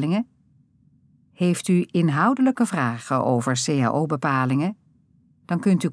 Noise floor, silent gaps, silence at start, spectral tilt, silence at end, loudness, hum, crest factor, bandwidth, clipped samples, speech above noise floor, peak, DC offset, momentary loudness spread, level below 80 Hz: -59 dBFS; none; 0 s; -6 dB/octave; 0 s; -22 LUFS; none; 16 dB; 11 kHz; under 0.1%; 38 dB; -6 dBFS; under 0.1%; 6 LU; -72 dBFS